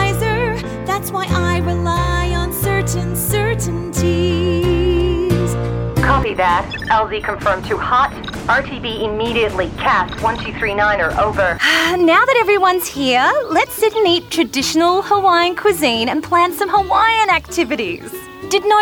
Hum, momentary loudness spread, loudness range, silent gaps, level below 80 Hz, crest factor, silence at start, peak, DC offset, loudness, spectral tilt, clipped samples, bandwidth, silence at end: none; 7 LU; 4 LU; none; -30 dBFS; 14 dB; 0 s; -2 dBFS; under 0.1%; -16 LUFS; -4.5 dB/octave; under 0.1%; over 20 kHz; 0 s